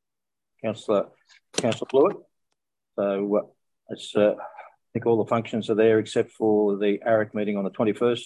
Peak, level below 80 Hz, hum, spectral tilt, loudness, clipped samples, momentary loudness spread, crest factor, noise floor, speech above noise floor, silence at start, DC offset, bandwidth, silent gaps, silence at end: -8 dBFS; -70 dBFS; none; -5.5 dB/octave; -24 LUFS; under 0.1%; 13 LU; 18 dB; -90 dBFS; 66 dB; 0.65 s; under 0.1%; 11.5 kHz; none; 0 s